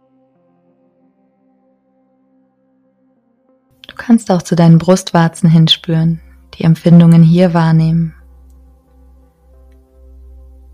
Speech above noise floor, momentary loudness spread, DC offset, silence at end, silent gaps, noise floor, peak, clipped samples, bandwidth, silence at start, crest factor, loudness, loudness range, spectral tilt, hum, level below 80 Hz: 48 dB; 10 LU; under 0.1%; 2.65 s; none; -57 dBFS; 0 dBFS; 0.5%; 11 kHz; 4 s; 14 dB; -10 LUFS; 9 LU; -7 dB/octave; none; -44 dBFS